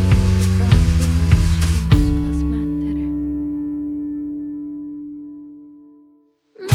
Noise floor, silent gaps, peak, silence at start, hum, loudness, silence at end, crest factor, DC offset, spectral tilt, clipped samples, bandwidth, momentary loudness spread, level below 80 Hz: -55 dBFS; none; -2 dBFS; 0 s; none; -19 LUFS; 0 s; 16 dB; under 0.1%; -6.5 dB/octave; under 0.1%; 14.5 kHz; 18 LU; -24 dBFS